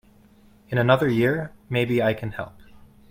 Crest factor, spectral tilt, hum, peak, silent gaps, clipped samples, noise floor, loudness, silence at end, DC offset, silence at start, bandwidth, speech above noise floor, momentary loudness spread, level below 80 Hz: 22 dB; -7.5 dB/octave; none; -4 dBFS; none; under 0.1%; -54 dBFS; -23 LUFS; 0.6 s; under 0.1%; 0.7 s; 16 kHz; 32 dB; 14 LU; -54 dBFS